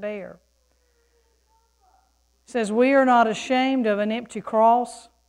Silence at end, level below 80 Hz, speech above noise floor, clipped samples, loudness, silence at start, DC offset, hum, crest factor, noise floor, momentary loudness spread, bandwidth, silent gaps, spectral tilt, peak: 0.3 s; -66 dBFS; 44 dB; under 0.1%; -21 LUFS; 0 s; under 0.1%; none; 16 dB; -65 dBFS; 16 LU; 11.5 kHz; none; -5 dB/octave; -6 dBFS